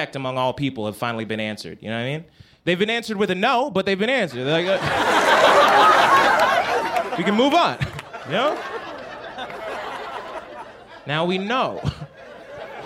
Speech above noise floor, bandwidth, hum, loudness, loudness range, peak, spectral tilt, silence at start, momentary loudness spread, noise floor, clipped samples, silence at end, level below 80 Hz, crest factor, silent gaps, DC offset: 21 dB; 16.5 kHz; none; -20 LUFS; 11 LU; -4 dBFS; -4.5 dB/octave; 0 s; 20 LU; -40 dBFS; under 0.1%; 0 s; -52 dBFS; 18 dB; none; under 0.1%